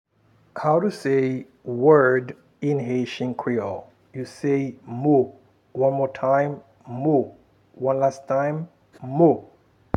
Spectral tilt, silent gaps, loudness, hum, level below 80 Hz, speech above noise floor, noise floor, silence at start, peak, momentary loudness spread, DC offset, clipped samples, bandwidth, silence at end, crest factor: -8 dB/octave; none; -22 LUFS; none; -70 dBFS; 38 dB; -60 dBFS; 0.55 s; -2 dBFS; 17 LU; under 0.1%; under 0.1%; 11 kHz; 0.55 s; 20 dB